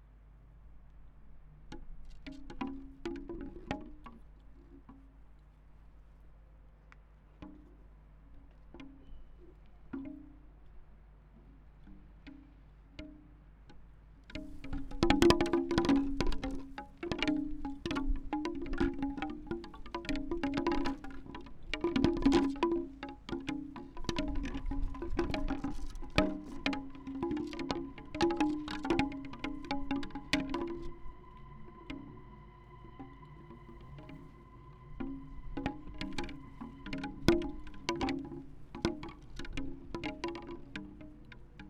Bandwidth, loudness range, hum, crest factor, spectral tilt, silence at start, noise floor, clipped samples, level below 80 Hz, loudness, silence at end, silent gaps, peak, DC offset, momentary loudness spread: 14.5 kHz; 20 LU; none; 32 dB; -5.5 dB/octave; 0 s; -58 dBFS; under 0.1%; -46 dBFS; -37 LUFS; 0 s; none; -6 dBFS; under 0.1%; 23 LU